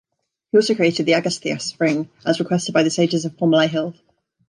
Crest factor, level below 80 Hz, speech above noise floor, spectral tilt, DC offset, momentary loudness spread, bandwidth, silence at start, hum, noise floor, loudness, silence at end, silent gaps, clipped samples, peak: 16 dB; -68 dBFS; 21 dB; -5 dB/octave; under 0.1%; 7 LU; 11 kHz; 0.55 s; none; -40 dBFS; -19 LUFS; 0.55 s; none; under 0.1%; -4 dBFS